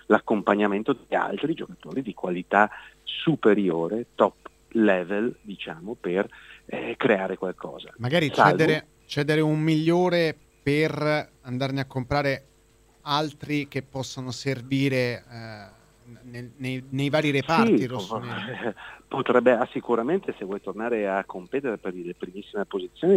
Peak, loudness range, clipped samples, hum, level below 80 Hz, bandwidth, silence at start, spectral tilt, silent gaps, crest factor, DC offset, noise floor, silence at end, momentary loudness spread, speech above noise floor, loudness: -2 dBFS; 6 LU; under 0.1%; none; -58 dBFS; 15.5 kHz; 0.1 s; -6.5 dB/octave; none; 24 dB; under 0.1%; -59 dBFS; 0 s; 14 LU; 34 dB; -25 LUFS